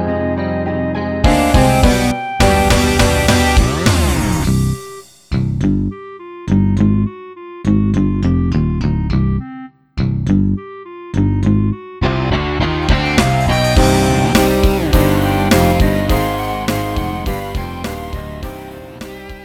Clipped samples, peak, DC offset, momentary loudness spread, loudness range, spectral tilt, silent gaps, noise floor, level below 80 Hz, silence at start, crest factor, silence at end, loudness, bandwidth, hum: under 0.1%; 0 dBFS; under 0.1%; 16 LU; 5 LU; -5.5 dB/octave; none; -34 dBFS; -22 dBFS; 0 s; 14 dB; 0 s; -15 LUFS; 18 kHz; none